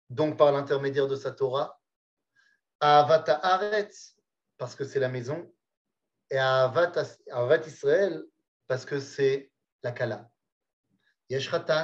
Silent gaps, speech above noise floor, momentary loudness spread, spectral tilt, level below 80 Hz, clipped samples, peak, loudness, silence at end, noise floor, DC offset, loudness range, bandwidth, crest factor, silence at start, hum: 1.96-2.17 s, 2.75-2.79 s, 5.77-5.85 s, 8.48-8.60 s, 9.72-9.79 s, 10.52-10.61 s, 10.73-10.83 s; 42 dB; 14 LU; -5.5 dB/octave; -82 dBFS; under 0.1%; -8 dBFS; -27 LUFS; 0 s; -68 dBFS; under 0.1%; 5 LU; 8 kHz; 20 dB; 0.1 s; none